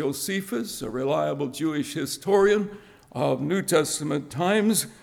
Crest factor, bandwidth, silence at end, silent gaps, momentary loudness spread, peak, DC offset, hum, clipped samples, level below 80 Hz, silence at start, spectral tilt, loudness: 16 dB; 18.5 kHz; 0.1 s; none; 9 LU; -8 dBFS; under 0.1%; none; under 0.1%; -60 dBFS; 0 s; -4.5 dB/octave; -25 LUFS